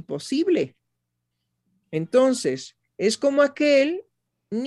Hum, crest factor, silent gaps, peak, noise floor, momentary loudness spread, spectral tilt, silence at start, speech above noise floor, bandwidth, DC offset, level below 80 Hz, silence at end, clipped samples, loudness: 60 Hz at -60 dBFS; 18 dB; none; -6 dBFS; -79 dBFS; 13 LU; -4.5 dB/octave; 0.1 s; 58 dB; 12 kHz; under 0.1%; -72 dBFS; 0 s; under 0.1%; -22 LUFS